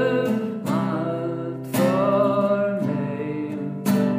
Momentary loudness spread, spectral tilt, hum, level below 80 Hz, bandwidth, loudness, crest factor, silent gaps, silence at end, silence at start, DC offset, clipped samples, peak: 9 LU; -7 dB/octave; none; -64 dBFS; 16 kHz; -23 LUFS; 14 dB; none; 0 s; 0 s; under 0.1%; under 0.1%; -8 dBFS